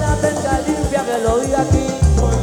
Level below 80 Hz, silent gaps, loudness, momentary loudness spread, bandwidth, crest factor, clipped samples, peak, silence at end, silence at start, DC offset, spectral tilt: -22 dBFS; none; -17 LUFS; 3 LU; 15 kHz; 14 dB; under 0.1%; -2 dBFS; 0 s; 0 s; under 0.1%; -6 dB/octave